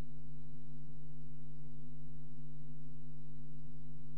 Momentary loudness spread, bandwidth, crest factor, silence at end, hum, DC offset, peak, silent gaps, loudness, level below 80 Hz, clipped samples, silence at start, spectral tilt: 1 LU; 5.6 kHz; 10 dB; 0 s; none; 3%; -28 dBFS; none; -54 LUFS; -62 dBFS; under 0.1%; 0 s; -10.5 dB/octave